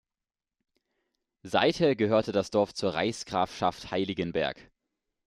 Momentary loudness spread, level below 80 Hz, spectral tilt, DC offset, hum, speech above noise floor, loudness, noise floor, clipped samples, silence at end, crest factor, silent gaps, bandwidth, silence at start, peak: 7 LU; -62 dBFS; -5 dB/octave; under 0.1%; none; over 62 dB; -28 LUFS; under -90 dBFS; under 0.1%; 0.65 s; 20 dB; none; 12.5 kHz; 1.45 s; -10 dBFS